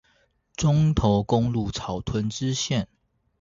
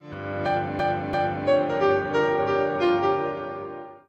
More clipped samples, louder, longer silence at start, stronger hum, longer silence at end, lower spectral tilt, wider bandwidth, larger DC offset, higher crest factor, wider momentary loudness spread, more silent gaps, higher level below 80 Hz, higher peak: neither; about the same, -24 LUFS vs -24 LUFS; first, 0.6 s vs 0 s; neither; first, 0.55 s vs 0.1 s; about the same, -6 dB/octave vs -7 dB/octave; about the same, 7.8 kHz vs 8 kHz; neither; about the same, 18 dB vs 16 dB; about the same, 9 LU vs 11 LU; neither; first, -40 dBFS vs -56 dBFS; about the same, -6 dBFS vs -8 dBFS